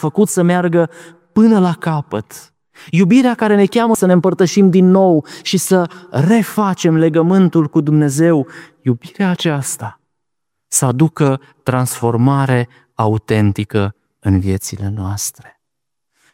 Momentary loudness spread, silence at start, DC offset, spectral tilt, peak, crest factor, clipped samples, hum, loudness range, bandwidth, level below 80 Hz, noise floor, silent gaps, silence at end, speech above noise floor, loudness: 11 LU; 0 s; under 0.1%; -6 dB/octave; 0 dBFS; 14 dB; under 0.1%; none; 5 LU; 16.5 kHz; -52 dBFS; -80 dBFS; none; 1.05 s; 67 dB; -14 LUFS